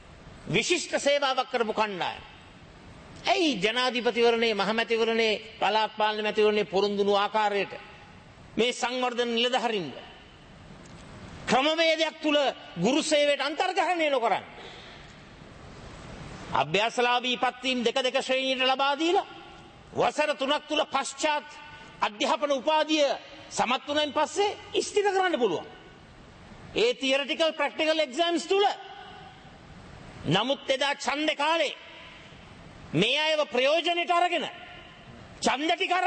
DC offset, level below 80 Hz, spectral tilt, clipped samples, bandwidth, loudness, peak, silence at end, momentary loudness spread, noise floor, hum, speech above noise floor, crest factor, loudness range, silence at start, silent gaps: under 0.1%; -60 dBFS; -3.5 dB/octave; under 0.1%; 8.8 kHz; -26 LUFS; -8 dBFS; 0 s; 20 LU; -50 dBFS; none; 24 dB; 20 dB; 4 LU; 0.1 s; none